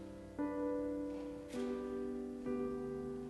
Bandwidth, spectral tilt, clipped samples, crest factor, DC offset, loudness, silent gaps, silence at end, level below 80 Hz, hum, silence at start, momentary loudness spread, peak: 12 kHz; -7 dB/octave; under 0.1%; 12 dB; under 0.1%; -42 LUFS; none; 0 s; -62 dBFS; none; 0 s; 5 LU; -30 dBFS